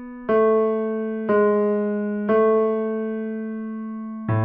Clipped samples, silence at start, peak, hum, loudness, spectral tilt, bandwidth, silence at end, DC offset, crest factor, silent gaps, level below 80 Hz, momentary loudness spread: under 0.1%; 0 s; -8 dBFS; none; -22 LUFS; -8 dB/octave; 3.6 kHz; 0 s; under 0.1%; 12 dB; none; -60 dBFS; 12 LU